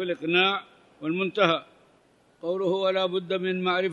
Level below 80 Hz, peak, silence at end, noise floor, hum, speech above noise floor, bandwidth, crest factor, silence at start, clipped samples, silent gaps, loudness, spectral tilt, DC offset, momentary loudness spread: -76 dBFS; -6 dBFS; 0 s; -61 dBFS; none; 36 dB; 7.2 kHz; 22 dB; 0 s; under 0.1%; none; -26 LUFS; -6 dB/octave; under 0.1%; 10 LU